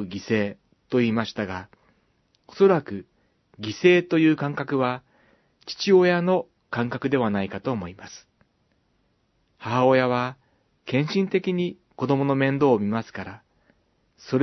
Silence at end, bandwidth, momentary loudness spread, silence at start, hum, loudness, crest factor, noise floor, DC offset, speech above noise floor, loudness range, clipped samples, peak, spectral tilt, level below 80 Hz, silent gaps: 0 s; 6.2 kHz; 18 LU; 0 s; none; -23 LUFS; 20 dB; -68 dBFS; under 0.1%; 45 dB; 5 LU; under 0.1%; -4 dBFS; -7 dB/octave; -66 dBFS; none